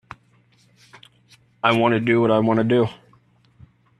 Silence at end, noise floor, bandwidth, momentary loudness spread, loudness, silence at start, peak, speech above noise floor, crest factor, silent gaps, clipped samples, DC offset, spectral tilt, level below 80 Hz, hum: 1.05 s; -58 dBFS; 11 kHz; 4 LU; -19 LUFS; 1.65 s; -2 dBFS; 40 dB; 22 dB; none; under 0.1%; under 0.1%; -7.5 dB/octave; -60 dBFS; none